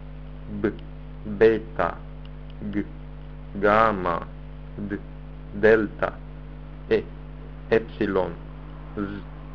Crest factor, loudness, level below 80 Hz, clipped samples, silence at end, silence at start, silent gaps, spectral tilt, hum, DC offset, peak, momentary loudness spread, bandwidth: 24 dB; -24 LUFS; -40 dBFS; under 0.1%; 0 s; 0 s; none; -8.5 dB/octave; none; 0.6%; -2 dBFS; 22 LU; 6.4 kHz